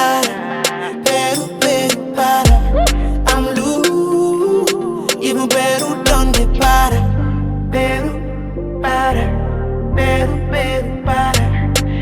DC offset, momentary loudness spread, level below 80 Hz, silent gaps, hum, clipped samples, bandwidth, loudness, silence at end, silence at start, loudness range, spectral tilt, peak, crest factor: under 0.1%; 6 LU; -20 dBFS; none; none; under 0.1%; 19 kHz; -16 LUFS; 0 s; 0 s; 3 LU; -4.5 dB/octave; 0 dBFS; 14 dB